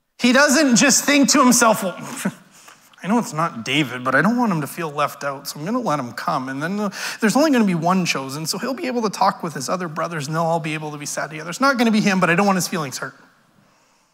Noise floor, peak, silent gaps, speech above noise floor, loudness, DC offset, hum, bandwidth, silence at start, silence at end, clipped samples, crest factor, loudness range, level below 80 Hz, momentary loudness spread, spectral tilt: -58 dBFS; -4 dBFS; none; 39 dB; -19 LUFS; under 0.1%; none; 16 kHz; 0.2 s; 1 s; under 0.1%; 16 dB; 5 LU; -68 dBFS; 13 LU; -3.5 dB/octave